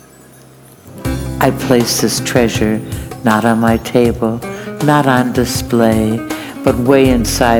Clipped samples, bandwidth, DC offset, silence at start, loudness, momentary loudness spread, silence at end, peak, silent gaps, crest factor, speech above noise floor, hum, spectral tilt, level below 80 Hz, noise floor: 0.1%; 19.5 kHz; under 0.1%; 0.85 s; -14 LUFS; 10 LU; 0 s; 0 dBFS; none; 14 dB; 28 dB; none; -5 dB/octave; -32 dBFS; -40 dBFS